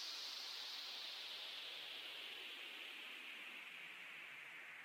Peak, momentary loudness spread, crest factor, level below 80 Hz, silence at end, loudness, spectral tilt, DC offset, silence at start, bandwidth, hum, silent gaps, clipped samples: -38 dBFS; 5 LU; 14 dB; under -90 dBFS; 0 s; -49 LUFS; 1 dB/octave; under 0.1%; 0 s; 16.5 kHz; none; none; under 0.1%